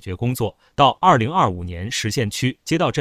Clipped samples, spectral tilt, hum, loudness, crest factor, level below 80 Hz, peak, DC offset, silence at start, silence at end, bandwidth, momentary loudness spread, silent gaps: under 0.1%; -5 dB/octave; none; -20 LUFS; 20 dB; -42 dBFS; 0 dBFS; under 0.1%; 0.05 s; 0 s; 16 kHz; 10 LU; none